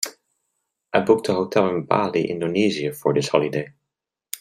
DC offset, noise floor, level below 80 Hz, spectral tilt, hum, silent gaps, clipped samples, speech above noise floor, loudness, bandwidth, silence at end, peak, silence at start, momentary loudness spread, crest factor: under 0.1%; -83 dBFS; -62 dBFS; -5 dB/octave; none; none; under 0.1%; 63 dB; -21 LUFS; 16 kHz; 0.05 s; -2 dBFS; 0 s; 10 LU; 20 dB